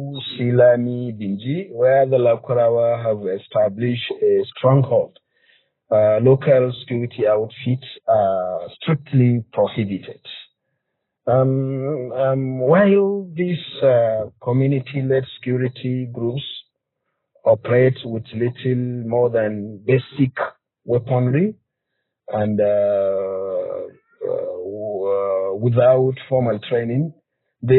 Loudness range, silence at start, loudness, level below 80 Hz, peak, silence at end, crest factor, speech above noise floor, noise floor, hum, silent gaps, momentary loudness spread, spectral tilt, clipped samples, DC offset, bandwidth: 4 LU; 0 s; -19 LUFS; -64 dBFS; -4 dBFS; 0 s; 16 dB; 59 dB; -77 dBFS; none; none; 12 LU; -7 dB/octave; under 0.1%; under 0.1%; 4.3 kHz